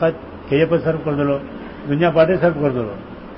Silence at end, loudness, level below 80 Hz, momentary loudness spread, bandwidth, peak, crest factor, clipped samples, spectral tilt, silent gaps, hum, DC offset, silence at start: 0 s; -18 LUFS; -44 dBFS; 17 LU; 5.8 kHz; -2 dBFS; 16 dB; under 0.1%; -12 dB/octave; none; none; under 0.1%; 0 s